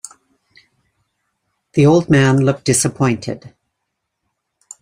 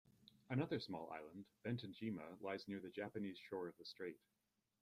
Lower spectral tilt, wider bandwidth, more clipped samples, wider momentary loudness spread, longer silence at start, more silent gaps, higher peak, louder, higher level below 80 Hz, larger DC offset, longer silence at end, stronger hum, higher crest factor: second, -5.5 dB/octave vs -7.5 dB/octave; about the same, 15.5 kHz vs 15 kHz; neither; first, 16 LU vs 8 LU; first, 1.75 s vs 0.05 s; neither; first, -2 dBFS vs -30 dBFS; first, -14 LUFS vs -49 LUFS; first, -52 dBFS vs -82 dBFS; neither; first, 1.35 s vs 0.65 s; neither; about the same, 16 dB vs 18 dB